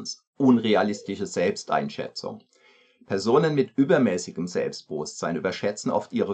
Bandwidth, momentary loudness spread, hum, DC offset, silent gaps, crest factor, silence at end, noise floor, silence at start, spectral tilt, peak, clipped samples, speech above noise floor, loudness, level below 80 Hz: 9 kHz; 12 LU; none; under 0.1%; 0.27-0.33 s; 18 dB; 0 s; -59 dBFS; 0 s; -5.5 dB/octave; -6 dBFS; under 0.1%; 35 dB; -25 LUFS; -70 dBFS